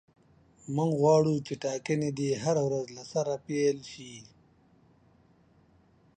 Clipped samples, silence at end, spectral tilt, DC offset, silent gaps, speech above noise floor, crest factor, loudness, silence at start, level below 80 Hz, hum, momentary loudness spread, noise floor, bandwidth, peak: under 0.1%; 1.95 s; -6 dB/octave; under 0.1%; none; 34 dB; 20 dB; -29 LUFS; 0.65 s; -68 dBFS; none; 20 LU; -63 dBFS; 9.4 kHz; -12 dBFS